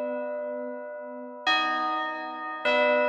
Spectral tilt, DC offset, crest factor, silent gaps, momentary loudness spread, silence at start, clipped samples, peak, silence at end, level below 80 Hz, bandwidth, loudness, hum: -2 dB/octave; under 0.1%; 16 dB; none; 14 LU; 0 s; under 0.1%; -12 dBFS; 0 s; -70 dBFS; 8.8 kHz; -28 LUFS; none